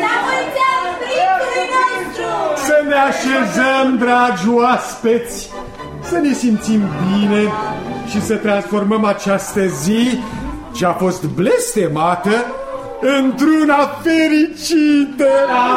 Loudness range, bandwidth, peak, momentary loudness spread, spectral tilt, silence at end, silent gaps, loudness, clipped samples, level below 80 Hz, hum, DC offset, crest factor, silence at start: 3 LU; 16 kHz; -2 dBFS; 9 LU; -5 dB/octave; 0 s; none; -15 LUFS; under 0.1%; -44 dBFS; none; under 0.1%; 12 dB; 0 s